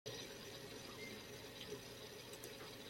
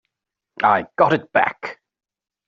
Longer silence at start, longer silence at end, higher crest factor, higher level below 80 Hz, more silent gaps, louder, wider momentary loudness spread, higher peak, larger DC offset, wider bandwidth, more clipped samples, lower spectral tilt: second, 0.05 s vs 0.6 s; second, 0 s vs 0.75 s; about the same, 20 dB vs 20 dB; second, -74 dBFS vs -64 dBFS; neither; second, -52 LUFS vs -19 LUFS; second, 2 LU vs 13 LU; second, -34 dBFS vs -2 dBFS; neither; first, 16.5 kHz vs 7.4 kHz; neither; about the same, -3 dB/octave vs -3.5 dB/octave